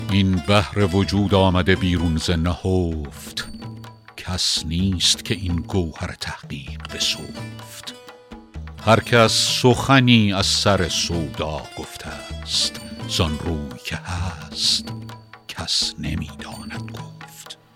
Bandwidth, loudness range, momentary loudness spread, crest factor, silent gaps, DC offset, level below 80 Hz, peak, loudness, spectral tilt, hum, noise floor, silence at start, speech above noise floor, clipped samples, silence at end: 16 kHz; 8 LU; 20 LU; 20 dB; none; under 0.1%; -40 dBFS; 0 dBFS; -20 LUFS; -4.5 dB/octave; none; -42 dBFS; 0 s; 21 dB; under 0.1%; 0.2 s